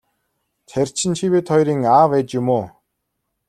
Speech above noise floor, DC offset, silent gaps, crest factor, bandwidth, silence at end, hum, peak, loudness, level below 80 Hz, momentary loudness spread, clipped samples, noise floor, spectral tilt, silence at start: 58 dB; under 0.1%; none; 16 dB; 13.5 kHz; 0.8 s; none; -2 dBFS; -18 LUFS; -58 dBFS; 9 LU; under 0.1%; -75 dBFS; -5.5 dB/octave; 0.75 s